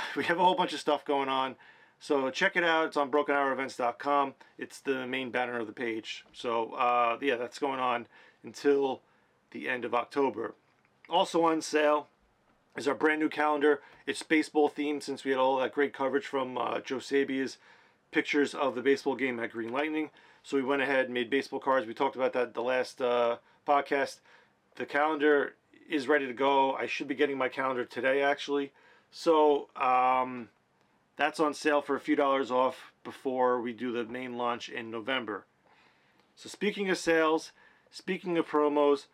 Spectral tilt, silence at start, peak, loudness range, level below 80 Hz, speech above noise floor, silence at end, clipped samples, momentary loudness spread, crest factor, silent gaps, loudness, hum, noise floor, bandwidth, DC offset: -4 dB/octave; 0 s; -10 dBFS; 4 LU; -80 dBFS; 40 dB; 0.1 s; under 0.1%; 11 LU; 20 dB; none; -30 LUFS; none; -69 dBFS; 13 kHz; under 0.1%